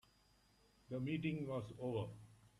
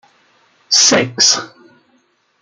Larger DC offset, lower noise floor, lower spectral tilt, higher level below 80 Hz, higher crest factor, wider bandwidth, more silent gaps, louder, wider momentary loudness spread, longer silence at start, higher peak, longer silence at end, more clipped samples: neither; first, -73 dBFS vs -59 dBFS; first, -8 dB/octave vs -1 dB/octave; second, -72 dBFS vs -66 dBFS; about the same, 16 dB vs 18 dB; about the same, 13 kHz vs 12 kHz; neither; second, -44 LUFS vs -11 LUFS; first, 9 LU vs 5 LU; first, 0.9 s vs 0.7 s; second, -28 dBFS vs 0 dBFS; second, 0.1 s vs 0.95 s; neither